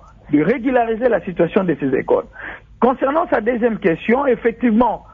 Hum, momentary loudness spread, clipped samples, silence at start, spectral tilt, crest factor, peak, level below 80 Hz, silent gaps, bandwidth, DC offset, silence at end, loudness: none; 4 LU; under 0.1%; 0.3 s; -9.5 dB/octave; 14 dB; -2 dBFS; -46 dBFS; none; 4.3 kHz; under 0.1%; 0.15 s; -17 LUFS